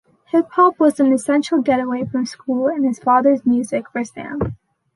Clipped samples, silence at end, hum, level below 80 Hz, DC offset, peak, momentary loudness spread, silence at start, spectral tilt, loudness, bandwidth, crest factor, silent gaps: under 0.1%; 0.4 s; none; -48 dBFS; under 0.1%; -2 dBFS; 11 LU; 0.35 s; -6 dB/octave; -18 LUFS; 11.5 kHz; 16 dB; none